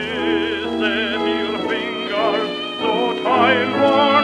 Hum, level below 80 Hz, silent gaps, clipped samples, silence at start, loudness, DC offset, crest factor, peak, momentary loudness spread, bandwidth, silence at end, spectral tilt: none; -52 dBFS; none; under 0.1%; 0 s; -18 LUFS; under 0.1%; 18 dB; 0 dBFS; 7 LU; 11 kHz; 0 s; -5 dB/octave